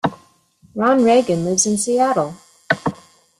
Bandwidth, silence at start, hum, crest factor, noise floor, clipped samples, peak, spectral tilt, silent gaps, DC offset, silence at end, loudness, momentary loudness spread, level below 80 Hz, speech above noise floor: 13 kHz; 0.05 s; none; 18 dB; -54 dBFS; under 0.1%; -2 dBFS; -4 dB/octave; none; under 0.1%; 0.45 s; -17 LUFS; 12 LU; -58 dBFS; 38 dB